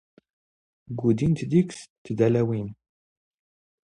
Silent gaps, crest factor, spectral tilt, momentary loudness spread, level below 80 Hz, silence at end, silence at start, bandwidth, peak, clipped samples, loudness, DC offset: 1.90-2.05 s; 20 dB; -8 dB/octave; 15 LU; -56 dBFS; 1.15 s; 0.9 s; 10.5 kHz; -8 dBFS; under 0.1%; -24 LUFS; under 0.1%